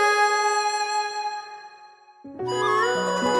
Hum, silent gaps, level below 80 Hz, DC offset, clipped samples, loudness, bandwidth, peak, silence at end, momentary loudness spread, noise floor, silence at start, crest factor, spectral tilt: none; none; -66 dBFS; under 0.1%; under 0.1%; -23 LUFS; 12 kHz; -10 dBFS; 0 s; 18 LU; -49 dBFS; 0 s; 14 dB; -2.5 dB/octave